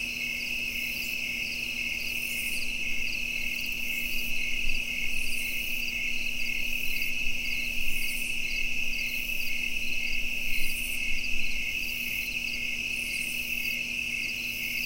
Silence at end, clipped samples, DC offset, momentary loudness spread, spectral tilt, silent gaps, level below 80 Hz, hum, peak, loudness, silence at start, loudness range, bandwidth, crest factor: 0 s; under 0.1%; under 0.1%; 1 LU; -1 dB/octave; none; -38 dBFS; none; -12 dBFS; -29 LUFS; 0 s; 0 LU; 16 kHz; 16 dB